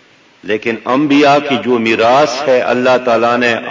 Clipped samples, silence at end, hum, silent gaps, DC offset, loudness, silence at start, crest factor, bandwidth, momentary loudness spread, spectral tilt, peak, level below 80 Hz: under 0.1%; 0 s; none; none; under 0.1%; -12 LUFS; 0.45 s; 10 dB; 7.6 kHz; 8 LU; -5 dB/octave; -2 dBFS; -54 dBFS